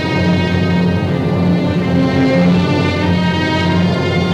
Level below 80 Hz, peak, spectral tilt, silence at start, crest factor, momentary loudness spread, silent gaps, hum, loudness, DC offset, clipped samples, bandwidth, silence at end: -38 dBFS; -2 dBFS; -7.5 dB/octave; 0 s; 12 dB; 3 LU; none; none; -14 LUFS; under 0.1%; under 0.1%; 8.4 kHz; 0 s